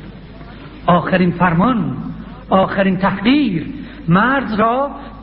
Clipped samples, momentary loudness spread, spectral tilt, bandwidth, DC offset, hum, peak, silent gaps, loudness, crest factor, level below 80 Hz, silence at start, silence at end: under 0.1%; 19 LU; -12.5 dB/octave; 5.4 kHz; under 0.1%; none; -2 dBFS; none; -16 LUFS; 14 dB; -38 dBFS; 0 s; 0 s